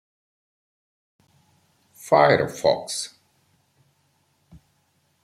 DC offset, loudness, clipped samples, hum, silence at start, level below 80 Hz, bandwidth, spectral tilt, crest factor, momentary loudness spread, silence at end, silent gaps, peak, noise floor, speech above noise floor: under 0.1%; -21 LUFS; under 0.1%; none; 2.05 s; -64 dBFS; 15 kHz; -4 dB/octave; 24 dB; 17 LU; 2.15 s; none; -2 dBFS; -67 dBFS; 47 dB